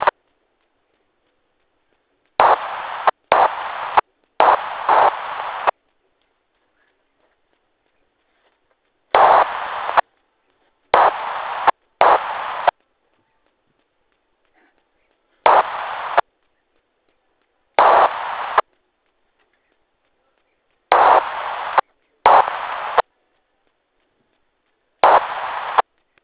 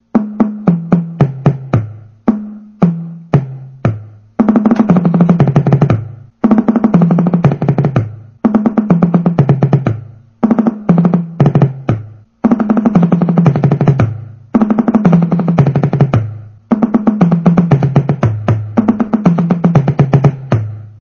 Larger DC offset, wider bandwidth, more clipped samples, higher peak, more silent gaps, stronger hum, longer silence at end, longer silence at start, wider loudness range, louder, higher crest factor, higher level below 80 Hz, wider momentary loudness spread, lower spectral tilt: neither; second, 4 kHz vs 6.4 kHz; second, under 0.1% vs 0.5%; about the same, 0 dBFS vs 0 dBFS; neither; neither; first, 0.4 s vs 0.1 s; second, 0 s vs 0.15 s; about the same, 5 LU vs 4 LU; second, -17 LUFS vs -12 LUFS; first, 20 dB vs 12 dB; second, -58 dBFS vs -42 dBFS; first, 12 LU vs 8 LU; second, -6 dB/octave vs -10.5 dB/octave